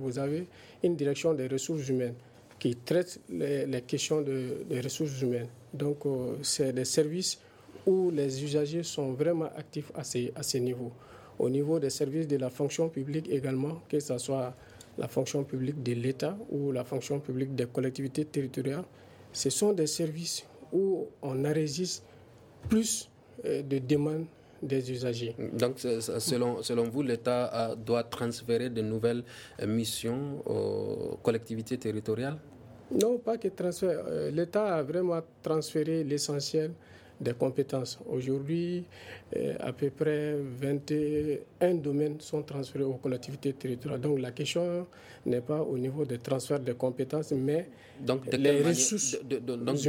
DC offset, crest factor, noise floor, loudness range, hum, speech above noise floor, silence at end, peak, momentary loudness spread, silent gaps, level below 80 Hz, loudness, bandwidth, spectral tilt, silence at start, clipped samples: under 0.1%; 20 dB; -54 dBFS; 3 LU; none; 23 dB; 0 s; -12 dBFS; 8 LU; none; -66 dBFS; -32 LUFS; 17 kHz; -5 dB/octave; 0 s; under 0.1%